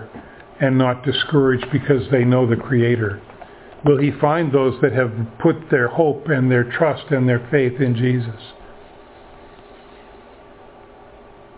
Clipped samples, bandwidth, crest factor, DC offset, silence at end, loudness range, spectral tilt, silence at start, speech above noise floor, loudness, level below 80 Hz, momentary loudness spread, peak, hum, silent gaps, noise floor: under 0.1%; 4 kHz; 18 dB; under 0.1%; 2.1 s; 6 LU; -11.5 dB/octave; 0 s; 26 dB; -18 LUFS; -50 dBFS; 6 LU; -2 dBFS; none; none; -43 dBFS